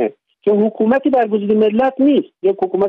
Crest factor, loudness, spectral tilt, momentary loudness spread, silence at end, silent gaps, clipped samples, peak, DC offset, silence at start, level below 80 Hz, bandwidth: 10 dB; -15 LUFS; -9 dB/octave; 5 LU; 0 s; none; under 0.1%; -4 dBFS; under 0.1%; 0 s; -60 dBFS; 4.3 kHz